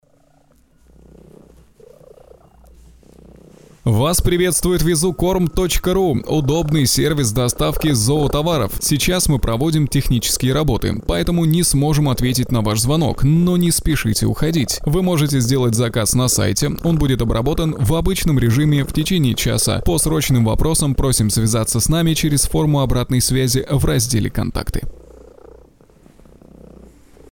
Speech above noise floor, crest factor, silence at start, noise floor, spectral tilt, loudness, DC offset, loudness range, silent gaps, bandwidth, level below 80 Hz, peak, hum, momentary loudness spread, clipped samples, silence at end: 39 dB; 12 dB; 3.85 s; -55 dBFS; -5 dB/octave; -17 LUFS; 0.2%; 4 LU; none; 19.5 kHz; -28 dBFS; -6 dBFS; none; 3 LU; under 0.1%; 1.8 s